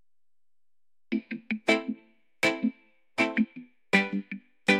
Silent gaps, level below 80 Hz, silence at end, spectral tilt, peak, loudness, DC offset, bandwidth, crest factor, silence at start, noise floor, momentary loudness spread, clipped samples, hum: none; -76 dBFS; 0 s; -4.5 dB/octave; -6 dBFS; -29 LUFS; under 0.1%; 14.5 kHz; 24 dB; 1.1 s; under -90 dBFS; 13 LU; under 0.1%; none